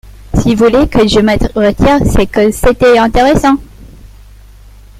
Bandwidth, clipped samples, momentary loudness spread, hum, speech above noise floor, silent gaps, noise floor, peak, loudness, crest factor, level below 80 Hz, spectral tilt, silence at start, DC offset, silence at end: 16 kHz; under 0.1%; 5 LU; 50 Hz at -35 dBFS; 27 dB; none; -36 dBFS; 0 dBFS; -9 LUFS; 10 dB; -22 dBFS; -6 dB/octave; 0.05 s; under 0.1%; 0.95 s